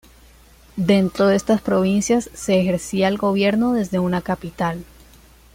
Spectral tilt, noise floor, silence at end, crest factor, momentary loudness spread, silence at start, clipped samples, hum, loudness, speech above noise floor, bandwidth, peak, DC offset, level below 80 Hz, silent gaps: -6 dB/octave; -48 dBFS; 0.7 s; 16 dB; 8 LU; 0.75 s; under 0.1%; none; -19 LUFS; 30 dB; 16 kHz; -4 dBFS; under 0.1%; -48 dBFS; none